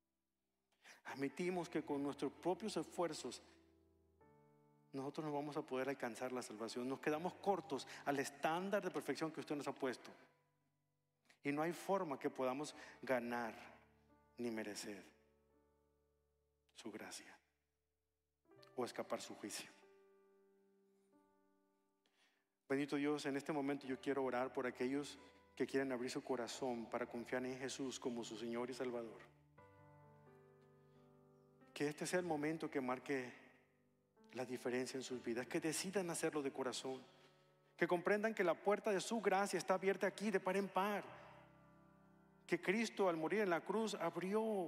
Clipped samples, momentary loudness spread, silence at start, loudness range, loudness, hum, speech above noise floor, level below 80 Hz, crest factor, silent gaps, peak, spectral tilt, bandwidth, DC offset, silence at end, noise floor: under 0.1%; 13 LU; 0.85 s; 12 LU; -43 LUFS; none; over 47 dB; -86 dBFS; 22 dB; none; -22 dBFS; -4.5 dB/octave; 15.5 kHz; under 0.1%; 0 s; under -90 dBFS